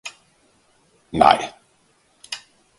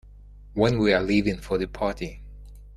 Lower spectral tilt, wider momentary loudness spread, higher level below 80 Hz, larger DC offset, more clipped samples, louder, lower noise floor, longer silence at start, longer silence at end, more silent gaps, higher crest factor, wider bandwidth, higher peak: second, -4 dB/octave vs -6.5 dB/octave; first, 18 LU vs 15 LU; second, -52 dBFS vs -42 dBFS; neither; neither; first, -17 LUFS vs -24 LUFS; first, -61 dBFS vs -46 dBFS; second, 0.05 s vs 0.2 s; first, 0.4 s vs 0 s; neither; about the same, 24 dB vs 20 dB; second, 11.5 kHz vs 13 kHz; first, 0 dBFS vs -6 dBFS